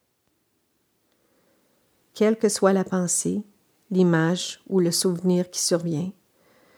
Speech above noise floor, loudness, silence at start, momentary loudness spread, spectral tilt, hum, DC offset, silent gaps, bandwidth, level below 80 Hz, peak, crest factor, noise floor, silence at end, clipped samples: 49 dB; -23 LUFS; 2.15 s; 8 LU; -4.5 dB/octave; none; under 0.1%; none; 18 kHz; -74 dBFS; -4 dBFS; 20 dB; -71 dBFS; 0.65 s; under 0.1%